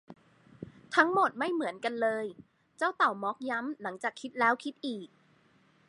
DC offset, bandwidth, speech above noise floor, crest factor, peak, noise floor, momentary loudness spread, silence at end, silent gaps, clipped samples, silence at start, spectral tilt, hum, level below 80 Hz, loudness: under 0.1%; 11.5 kHz; 35 dB; 24 dB; -10 dBFS; -65 dBFS; 14 LU; 0.85 s; none; under 0.1%; 0.1 s; -4.5 dB/octave; none; -78 dBFS; -31 LUFS